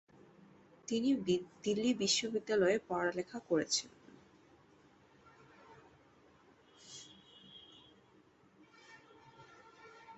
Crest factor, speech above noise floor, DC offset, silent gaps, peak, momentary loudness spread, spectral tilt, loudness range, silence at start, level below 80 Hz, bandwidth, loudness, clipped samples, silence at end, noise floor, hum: 20 dB; 32 dB; under 0.1%; none; -20 dBFS; 26 LU; -3 dB/octave; 24 LU; 0.9 s; -76 dBFS; 8 kHz; -34 LUFS; under 0.1%; 0 s; -66 dBFS; none